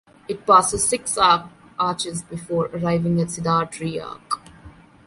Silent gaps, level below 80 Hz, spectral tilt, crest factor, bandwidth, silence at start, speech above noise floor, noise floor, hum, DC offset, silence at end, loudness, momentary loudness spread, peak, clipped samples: none; -50 dBFS; -4 dB/octave; 20 dB; 11.5 kHz; 0.3 s; 25 dB; -46 dBFS; none; under 0.1%; 0.35 s; -21 LUFS; 14 LU; -2 dBFS; under 0.1%